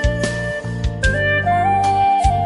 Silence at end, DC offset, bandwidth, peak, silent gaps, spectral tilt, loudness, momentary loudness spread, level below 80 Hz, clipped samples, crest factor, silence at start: 0 s; under 0.1%; 11.5 kHz; -4 dBFS; none; -5.5 dB/octave; -17 LUFS; 8 LU; -26 dBFS; under 0.1%; 14 dB; 0 s